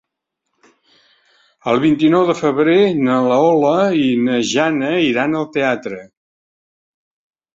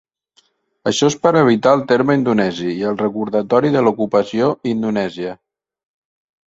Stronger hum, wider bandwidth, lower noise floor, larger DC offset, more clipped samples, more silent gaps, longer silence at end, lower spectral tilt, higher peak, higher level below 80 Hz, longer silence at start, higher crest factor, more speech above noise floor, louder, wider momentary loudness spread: neither; about the same, 7.8 kHz vs 8 kHz; first, -77 dBFS vs -59 dBFS; neither; neither; neither; first, 1.5 s vs 1.15 s; about the same, -5.5 dB/octave vs -5.5 dB/octave; about the same, -2 dBFS vs 0 dBFS; about the same, -58 dBFS vs -56 dBFS; first, 1.65 s vs 0.85 s; about the same, 16 dB vs 16 dB; first, 63 dB vs 43 dB; about the same, -15 LUFS vs -16 LUFS; about the same, 6 LU vs 8 LU